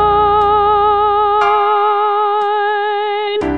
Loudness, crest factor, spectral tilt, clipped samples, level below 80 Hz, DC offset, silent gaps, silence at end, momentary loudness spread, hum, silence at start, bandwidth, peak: -13 LUFS; 10 dB; -6 dB/octave; under 0.1%; -38 dBFS; 0.5%; none; 0 s; 5 LU; none; 0 s; 6.2 kHz; -2 dBFS